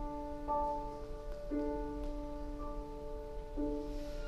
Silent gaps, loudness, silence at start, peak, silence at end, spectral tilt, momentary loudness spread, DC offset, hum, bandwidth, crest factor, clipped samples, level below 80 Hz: none; -42 LUFS; 0 s; -26 dBFS; 0 s; -7.5 dB/octave; 9 LU; under 0.1%; none; 13 kHz; 14 dB; under 0.1%; -44 dBFS